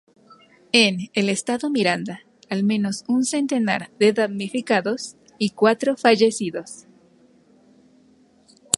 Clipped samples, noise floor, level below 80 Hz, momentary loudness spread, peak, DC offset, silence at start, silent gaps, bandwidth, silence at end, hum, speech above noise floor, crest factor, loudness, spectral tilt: under 0.1%; -56 dBFS; -66 dBFS; 13 LU; 0 dBFS; under 0.1%; 0.75 s; none; 13 kHz; 2 s; none; 35 dB; 22 dB; -21 LUFS; -4 dB/octave